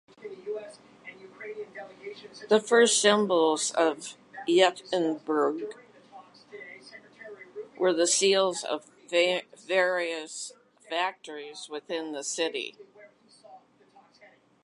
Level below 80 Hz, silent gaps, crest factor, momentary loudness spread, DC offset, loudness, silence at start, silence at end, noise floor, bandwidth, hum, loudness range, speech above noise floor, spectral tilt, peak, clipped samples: -84 dBFS; none; 22 dB; 23 LU; under 0.1%; -26 LUFS; 0.2 s; 1.05 s; -59 dBFS; 11.5 kHz; none; 10 LU; 33 dB; -2 dB/octave; -8 dBFS; under 0.1%